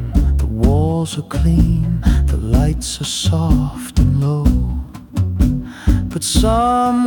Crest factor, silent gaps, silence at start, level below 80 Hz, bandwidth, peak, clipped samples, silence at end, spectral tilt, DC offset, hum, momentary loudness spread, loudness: 12 dB; none; 0 s; -20 dBFS; 18 kHz; -2 dBFS; under 0.1%; 0 s; -6 dB/octave; under 0.1%; none; 6 LU; -17 LUFS